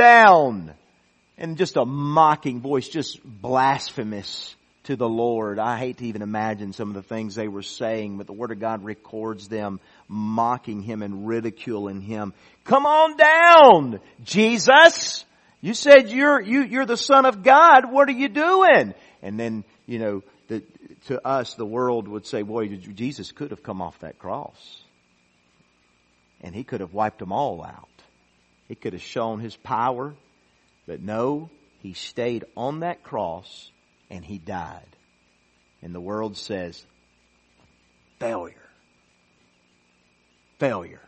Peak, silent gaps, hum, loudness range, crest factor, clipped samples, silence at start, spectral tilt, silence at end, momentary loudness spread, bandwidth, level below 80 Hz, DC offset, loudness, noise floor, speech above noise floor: 0 dBFS; none; 60 Hz at -60 dBFS; 20 LU; 22 dB; under 0.1%; 0 s; -4.5 dB/octave; 0.2 s; 22 LU; 8.4 kHz; -64 dBFS; under 0.1%; -19 LUFS; -63 dBFS; 43 dB